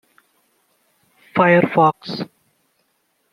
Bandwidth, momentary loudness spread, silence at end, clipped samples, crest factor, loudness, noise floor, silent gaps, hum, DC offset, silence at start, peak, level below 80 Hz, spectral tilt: 11 kHz; 16 LU; 1.05 s; under 0.1%; 20 dB; -17 LUFS; -67 dBFS; none; none; under 0.1%; 1.35 s; -2 dBFS; -64 dBFS; -8 dB/octave